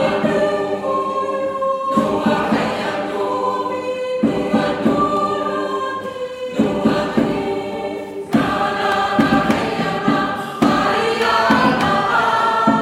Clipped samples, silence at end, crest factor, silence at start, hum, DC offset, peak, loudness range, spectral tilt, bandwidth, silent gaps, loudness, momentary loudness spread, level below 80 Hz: under 0.1%; 0 s; 16 dB; 0 s; none; under 0.1%; -2 dBFS; 4 LU; -5.5 dB/octave; 15.5 kHz; none; -18 LUFS; 7 LU; -48 dBFS